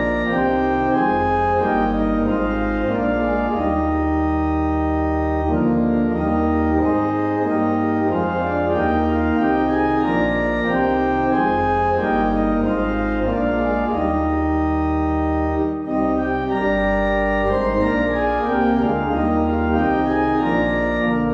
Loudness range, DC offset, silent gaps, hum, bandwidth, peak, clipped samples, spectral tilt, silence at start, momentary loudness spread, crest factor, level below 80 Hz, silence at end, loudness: 1 LU; under 0.1%; none; none; 6.6 kHz; -6 dBFS; under 0.1%; -9 dB/octave; 0 s; 2 LU; 12 dB; -30 dBFS; 0 s; -19 LUFS